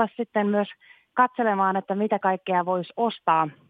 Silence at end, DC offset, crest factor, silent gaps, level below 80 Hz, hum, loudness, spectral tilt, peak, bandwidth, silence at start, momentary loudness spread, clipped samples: 0.2 s; under 0.1%; 18 dB; none; -80 dBFS; none; -24 LUFS; -9 dB/octave; -6 dBFS; 4.8 kHz; 0 s; 5 LU; under 0.1%